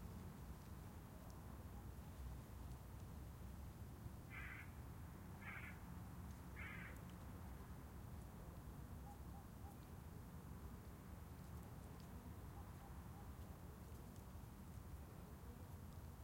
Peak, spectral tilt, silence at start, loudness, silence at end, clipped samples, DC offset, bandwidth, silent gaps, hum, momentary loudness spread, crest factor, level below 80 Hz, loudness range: -40 dBFS; -6 dB/octave; 0 s; -57 LUFS; 0 s; under 0.1%; under 0.1%; 16.5 kHz; none; none; 4 LU; 16 dB; -60 dBFS; 2 LU